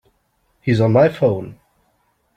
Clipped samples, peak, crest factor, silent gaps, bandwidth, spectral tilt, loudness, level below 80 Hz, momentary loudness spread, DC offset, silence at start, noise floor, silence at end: under 0.1%; -2 dBFS; 16 dB; none; 8.8 kHz; -8.5 dB/octave; -17 LUFS; -52 dBFS; 13 LU; under 0.1%; 0.65 s; -64 dBFS; 0.85 s